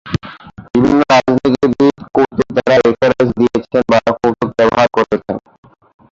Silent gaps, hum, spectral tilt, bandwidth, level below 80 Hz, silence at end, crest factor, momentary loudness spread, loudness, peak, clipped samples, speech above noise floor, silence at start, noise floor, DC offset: none; none; -6.5 dB/octave; 7.6 kHz; -42 dBFS; 0.75 s; 12 dB; 9 LU; -13 LUFS; 0 dBFS; under 0.1%; 22 dB; 0.05 s; -34 dBFS; under 0.1%